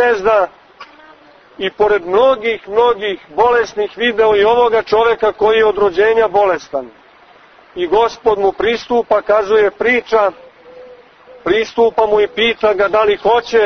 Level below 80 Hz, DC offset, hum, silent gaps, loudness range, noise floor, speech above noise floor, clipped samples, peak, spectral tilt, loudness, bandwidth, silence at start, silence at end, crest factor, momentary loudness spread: -46 dBFS; under 0.1%; none; none; 3 LU; -44 dBFS; 31 dB; under 0.1%; 0 dBFS; -4.5 dB/octave; -14 LUFS; 6.6 kHz; 0 s; 0 s; 14 dB; 8 LU